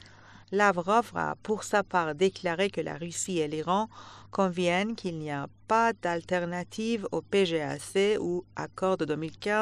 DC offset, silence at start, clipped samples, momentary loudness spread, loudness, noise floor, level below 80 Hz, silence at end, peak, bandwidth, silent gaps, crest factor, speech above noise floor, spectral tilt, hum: under 0.1%; 0.05 s; under 0.1%; 9 LU; -29 LUFS; -52 dBFS; -64 dBFS; 0 s; -10 dBFS; 13 kHz; none; 20 dB; 24 dB; -4.5 dB/octave; none